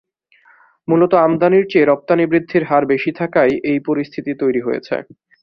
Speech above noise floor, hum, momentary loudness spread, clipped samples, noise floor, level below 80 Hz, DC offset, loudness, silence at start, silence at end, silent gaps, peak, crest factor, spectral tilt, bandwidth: 38 dB; none; 9 LU; under 0.1%; -53 dBFS; -58 dBFS; under 0.1%; -16 LUFS; 0.9 s; 0.4 s; none; -2 dBFS; 14 dB; -9 dB/octave; 6 kHz